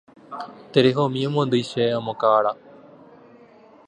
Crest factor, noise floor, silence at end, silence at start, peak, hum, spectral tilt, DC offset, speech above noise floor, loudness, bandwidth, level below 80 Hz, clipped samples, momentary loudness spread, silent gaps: 20 dB; -50 dBFS; 1.35 s; 0.3 s; -2 dBFS; none; -6.5 dB/octave; under 0.1%; 29 dB; -21 LUFS; 10 kHz; -68 dBFS; under 0.1%; 17 LU; none